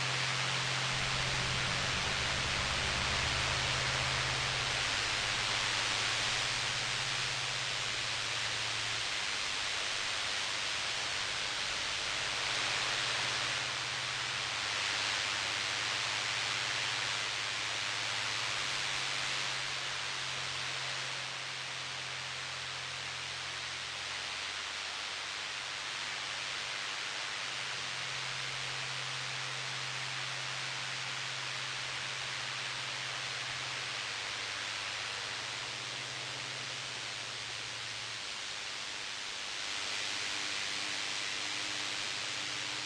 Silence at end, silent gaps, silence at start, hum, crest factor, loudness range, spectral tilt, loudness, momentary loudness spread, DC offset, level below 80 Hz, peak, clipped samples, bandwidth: 0 s; none; 0 s; none; 16 dB; 6 LU; -1 dB/octave; -34 LUFS; 7 LU; under 0.1%; -58 dBFS; -20 dBFS; under 0.1%; 11 kHz